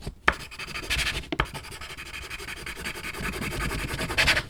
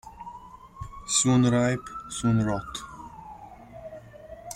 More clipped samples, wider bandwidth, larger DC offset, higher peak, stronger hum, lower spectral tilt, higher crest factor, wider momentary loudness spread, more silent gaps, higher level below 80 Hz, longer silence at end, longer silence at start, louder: neither; first, over 20 kHz vs 15 kHz; neither; first, -2 dBFS vs -8 dBFS; neither; second, -3 dB/octave vs -4.5 dB/octave; first, 28 dB vs 20 dB; second, 10 LU vs 25 LU; neither; first, -40 dBFS vs -50 dBFS; about the same, 0 s vs 0 s; about the same, 0 s vs 0.05 s; second, -29 LUFS vs -25 LUFS